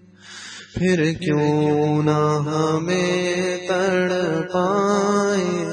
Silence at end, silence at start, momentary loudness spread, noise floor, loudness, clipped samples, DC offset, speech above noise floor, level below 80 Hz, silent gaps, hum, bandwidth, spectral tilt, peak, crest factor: 0 s; 0.25 s; 5 LU; -40 dBFS; -20 LUFS; under 0.1%; under 0.1%; 21 dB; -54 dBFS; none; none; 10 kHz; -6 dB/octave; -6 dBFS; 14 dB